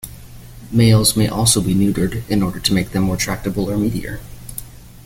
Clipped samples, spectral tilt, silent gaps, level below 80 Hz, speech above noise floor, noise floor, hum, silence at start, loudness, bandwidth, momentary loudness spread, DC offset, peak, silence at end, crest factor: under 0.1%; -4.5 dB/octave; none; -36 dBFS; 20 dB; -37 dBFS; none; 0.05 s; -17 LUFS; 17 kHz; 18 LU; under 0.1%; 0 dBFS; 0.15 s; 18 dB